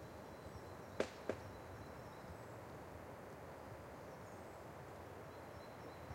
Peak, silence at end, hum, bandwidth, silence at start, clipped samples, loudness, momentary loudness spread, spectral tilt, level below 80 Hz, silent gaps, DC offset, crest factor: -22 dBFS; 0 s; none; 16 kHz; 0 s; under 0.1%; -52 LUFS; 8 LU; -5.5 dB/octave; -68 dBFS; none; under 0.1%; 30 dB